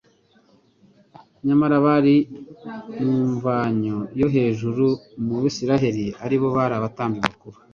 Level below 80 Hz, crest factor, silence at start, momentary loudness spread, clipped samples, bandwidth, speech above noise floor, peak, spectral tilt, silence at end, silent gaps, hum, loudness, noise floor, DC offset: -54 dBFS; 22 dB; 1.45 s; 10 LU; under 0.1%; 7.2 kHz; 38 dB; 0 dBFS; -7.5 dB/octave; 0.2 s; none; none; -21 LUFS; -58 dBFS; under 0.1%